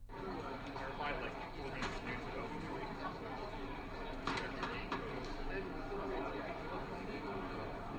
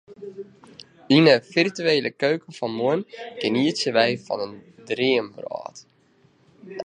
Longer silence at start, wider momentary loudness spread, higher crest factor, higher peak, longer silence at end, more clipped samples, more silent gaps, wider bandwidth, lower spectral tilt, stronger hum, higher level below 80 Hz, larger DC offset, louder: about the same, 0 s vs 0.1 s; second, 4 LU vs 22 LU; about the same, 18 dB vs 22 dB; second, -24 dBFS vs -2 dBFS; about the same, 0 s vs 0.05 s; neither; neither; first, over 20 kHz vs 10 kHz; about the same, -5.5 dB/octave vs -5 dB/octave; neither; first, -52 dBFS vs -72 dBFS; neither; second, -43 LUFS vs -22 LUFS